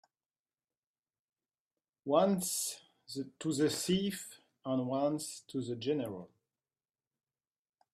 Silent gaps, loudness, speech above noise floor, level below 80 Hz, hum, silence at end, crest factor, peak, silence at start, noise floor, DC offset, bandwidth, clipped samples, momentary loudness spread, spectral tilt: none; -35 LUFS; over 56 dB; -76 dBFS; none; 1.7 s; 22 dB; -14 dBFS; 2.05 s; under -90 dBFS; under 0.1%; 15.5 kHz; under 0.1%; 16 LU; -4.5 dB/octave